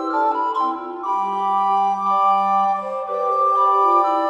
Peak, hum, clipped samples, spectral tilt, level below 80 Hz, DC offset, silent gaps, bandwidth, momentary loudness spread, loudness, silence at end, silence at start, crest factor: -4 dBFS; none; under 0.1%; -5.5 dB/octave; -68 dBFS; under 0.1%; none; 8.6 kHz; 8 LU; -19 LUFS; 0 s; 0 s; 14 dB